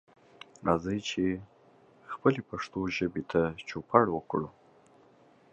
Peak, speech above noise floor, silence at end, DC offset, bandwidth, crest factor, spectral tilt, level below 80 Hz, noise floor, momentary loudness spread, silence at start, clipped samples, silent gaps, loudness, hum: -6 dBFS; 31 dB; 1 s; under 0.1%; 8.4 kHz; 26 dB; -6 dB/octave; -58 dBFS; -61 dBFS; 14 LU; 0.6 s; under 0.1%; none; -30 LUFS; none